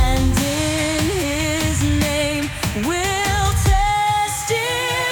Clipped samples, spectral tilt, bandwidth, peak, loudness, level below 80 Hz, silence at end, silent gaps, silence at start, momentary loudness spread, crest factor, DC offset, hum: under 0.1%; -4 dB/octave; 19.5 kHz; -4 dBFS; -19 LUFS; -26 dBFS; 0 s; none; 0 s; 3 LU; 14 dB; under 0.1%; none